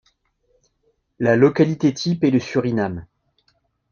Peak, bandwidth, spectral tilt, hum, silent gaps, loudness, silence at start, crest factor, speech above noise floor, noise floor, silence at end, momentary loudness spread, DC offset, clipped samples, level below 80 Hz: -2 dBFS; 7.2 kHz; -7 dB/octave; none; none; -19 LUFS; 1.2 s; 20 dB; 49 dB; -67 dBFS; 0.9 s; 8 LU; under 0.1%; under 0.1%; -56 dBFS